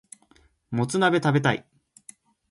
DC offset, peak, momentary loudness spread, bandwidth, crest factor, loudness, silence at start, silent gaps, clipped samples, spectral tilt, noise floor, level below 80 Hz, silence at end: under 0.1%; -6 dBFS; 11 LU; 11.5 kHz; 20 dB; -24 LUFS; 0.7 s; none; under 0.1%; -5.5 dB/octave; -60 dBFS; -62 dBFS; 0.9 s